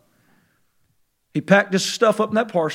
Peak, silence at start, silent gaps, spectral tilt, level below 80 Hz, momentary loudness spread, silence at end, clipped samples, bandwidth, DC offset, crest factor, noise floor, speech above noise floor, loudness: 0 dBFS; 1.35 s; none; -4.5 dB/octave; -74 dBFS; 10 LU; 0 s; under 0.1%; 15.5 kHz; under 0.1%; 22 dB; -66 dBFS; 47 dB; -19 LUFS